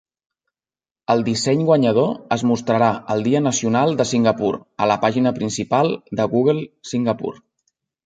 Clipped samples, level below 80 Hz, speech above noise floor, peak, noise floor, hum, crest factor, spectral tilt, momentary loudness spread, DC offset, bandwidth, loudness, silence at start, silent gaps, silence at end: under 0.1%; -58 dBFS; over 72 dB; -2 dBFS; under -90 dBFS; none; 18 dB; -5.5 dB/octave; 7 LU; under 0.1%; 9.4 kHz; -19 LUFS; 1.1 s; none; 0.7 s